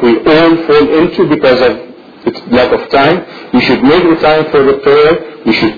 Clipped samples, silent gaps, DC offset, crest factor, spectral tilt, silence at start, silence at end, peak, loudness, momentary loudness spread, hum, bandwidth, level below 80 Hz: 0.3%; none; under 0.1%; 8 dB; -7.5 dB/octave; 0 s; 0 s; 0 dBFS; -9 LUFS; 7 LU; none; 5.4 kHz; -38 dBFS